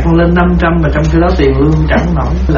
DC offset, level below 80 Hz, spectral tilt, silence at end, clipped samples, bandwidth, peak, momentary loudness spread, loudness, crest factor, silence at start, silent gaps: under 0.1%; -14 dBFS; -7 dB/octave; 0 s; under 0.1%; 7 kHz; 0 dBFS; 2 LU; -10 LUFS; 8 dB; 0 s; none